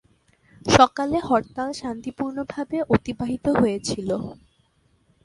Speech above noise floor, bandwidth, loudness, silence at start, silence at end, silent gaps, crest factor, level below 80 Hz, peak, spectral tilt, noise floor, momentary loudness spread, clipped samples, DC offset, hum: 41 dB; 11.5 kHz; -23 LUFS; 0.65 s; 0.9 s; none; 24 dB; -48 dBFS; 0 dBFS; -5 dB/octave; -63 dBFS; 14 LU; under 0.1%; under 0.1%; none